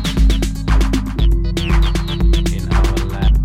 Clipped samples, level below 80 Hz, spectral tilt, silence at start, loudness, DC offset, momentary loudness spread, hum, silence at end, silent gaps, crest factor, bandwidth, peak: under 0.1%; -14 dBFS; -6 dB/octave; 0 s; -17 LUFS; under 0.1%; 2 LU; none; 0 s; none; 10 dB; 13.5 kHz; -4 dBFS